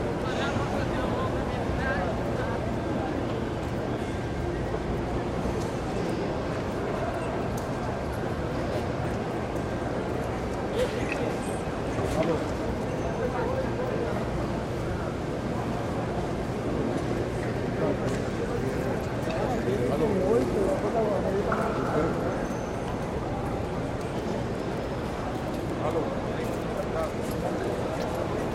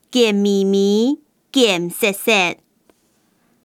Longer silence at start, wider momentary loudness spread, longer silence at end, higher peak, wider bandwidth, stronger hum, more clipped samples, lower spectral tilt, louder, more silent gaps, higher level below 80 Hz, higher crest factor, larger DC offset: about the same, 0 s vs 0.1 s; about the same, 4 LU vs 6 LU; second, 0 s vs 1.1 s; second, -12 dBFS vs -2 dBFS; about the same, 15.5 kHz vs 16.5 kHz; neither; neither; first, -6.5 dB/octave vs -4 dB/octave; second, -29 LUFS vs -17 LUFS; neither; first, -42 dBFS vs -72 dBFS; about the same, 16 dB vs 16 dB; neither